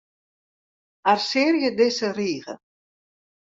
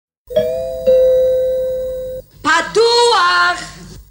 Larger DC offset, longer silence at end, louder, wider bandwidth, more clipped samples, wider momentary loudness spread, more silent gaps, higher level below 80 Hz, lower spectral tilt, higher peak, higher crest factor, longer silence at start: neither; first, 0.9 s vs 0.1 s; second, -22 LUFS vs -14 LUFS; second, 7.8 kHz vs 16.5 kHz; neither; about the same, 14 LU vs 13 LU; neither; second, -72 dBFS vs -42 dBFS; first, -4 dB/octave vs -2 dB/octave; about the same, -4 dBFS vs -2 dBFS; first, 20 dB vs 12 dB; first, 1.05 s vs 0.3 s